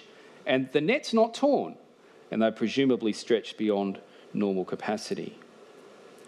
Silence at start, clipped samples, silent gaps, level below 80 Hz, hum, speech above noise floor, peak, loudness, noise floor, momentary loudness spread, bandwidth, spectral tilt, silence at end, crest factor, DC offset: 0.45 s; under 0.1%; none; -82 dBFS; none; 25 dB; -10 dBFS; -28 LUFS; -51 dBFS; 12 LU; 12 kHz; -5.5 dB/octave; 0.5 s; 18 dB; under 0.1%